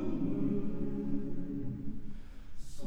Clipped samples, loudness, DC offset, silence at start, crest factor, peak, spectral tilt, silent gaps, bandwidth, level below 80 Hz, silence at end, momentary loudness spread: under 0.1%; -38 LUFS; under 0.1%; 0 s; 12 dB; -20 dBFS; -8.5 dB/octave; none; 8.6 kHz; -44 dBFS; 0 s; 18 LU